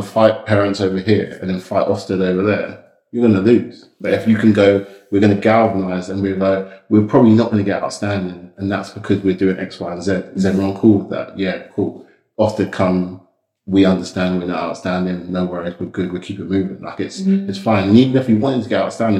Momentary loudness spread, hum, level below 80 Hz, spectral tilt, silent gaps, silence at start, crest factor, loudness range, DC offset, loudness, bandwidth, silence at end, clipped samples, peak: 12 LU; none; -56 dBFS; -7.5 dB/octave; none; 0 s; 16 dB; 5 LU; under 0.1%; -17 LUFS; 11 kHz; 0 s; under 0.1%; 0 dBFS